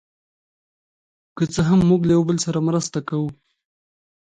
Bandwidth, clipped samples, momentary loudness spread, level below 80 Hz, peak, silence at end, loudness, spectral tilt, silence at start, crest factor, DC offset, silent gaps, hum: 9.4 kHz; under 0.1%; 10 LU; -50 dBFS; -6 dBFS; 1 s; -20 LUFS; -6.5 dB/octave; 1.35 s; 16 dB; under 0.1%; none; none